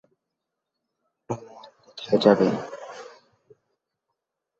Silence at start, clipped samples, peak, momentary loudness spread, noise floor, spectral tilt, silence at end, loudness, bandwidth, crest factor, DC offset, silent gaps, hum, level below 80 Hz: 1.3 s; under 0.1%; -2 dBFS; 23 LU; -83 dBFS; -6.5 dB/octave; 1.55 s; -23 LUFS; 7.8 kHz; 26 dB; under 0.1%; none; none; -68 dBFS